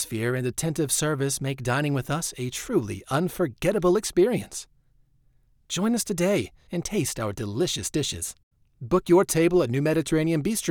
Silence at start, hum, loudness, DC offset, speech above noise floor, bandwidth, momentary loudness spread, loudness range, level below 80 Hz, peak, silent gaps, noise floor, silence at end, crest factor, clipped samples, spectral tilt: 0 s; none; -25 LUFS; under 0.1%; 37 dB; 19.5 kHz; 9 LU; 3 LU; -50 dBFS; -8 dBFS; 8.43-8.51 s; -62 dBFS; 0 s; 18 dB; under 0.1%; -5 dB/octave